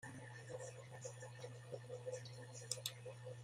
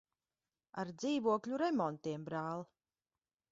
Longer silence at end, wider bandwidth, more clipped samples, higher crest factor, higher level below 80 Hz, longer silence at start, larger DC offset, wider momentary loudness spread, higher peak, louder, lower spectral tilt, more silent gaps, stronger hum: second, 0 s vs 0.85 s; first, 15 kHz vs 7.6 kHz; neither; first, 28 dB vs 20 dB; about the same, -82 dBFS vs -80 dBFS; second, 0 s vs 0.75 s; neither; second, 8 LU vs 11 LU; about the same, -22 dBFS vs -20 dBFS; second, -51 LUFS vs -38 LUFS; second, -3 dB/octave vs -5.5 dB/octave; neither; neither